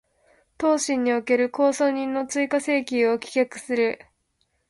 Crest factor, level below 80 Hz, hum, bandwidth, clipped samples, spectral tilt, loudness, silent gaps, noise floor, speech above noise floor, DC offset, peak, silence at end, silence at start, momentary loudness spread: 16 dB; -66 dBFS; none; 11.5 kHz; under 0.1%; -3 dB/octave; -23 LUFS; none; -71 dBFS; 49 dB; under 0.1%; -8 dBFS; 0.75 s; 0.6 s; 5 LU